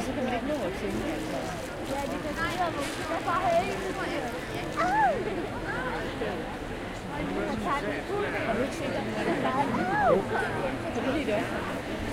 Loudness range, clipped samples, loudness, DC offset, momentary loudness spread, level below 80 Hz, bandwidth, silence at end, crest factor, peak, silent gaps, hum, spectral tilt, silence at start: 3 LU; under 0.1%; -30 LUFS; under 0.1%; 8 LU; -46 dBFS; 16.5 kHz; 0 s; 18 dB; -12 dBFS; none; none; -5 dB/octave; 0 s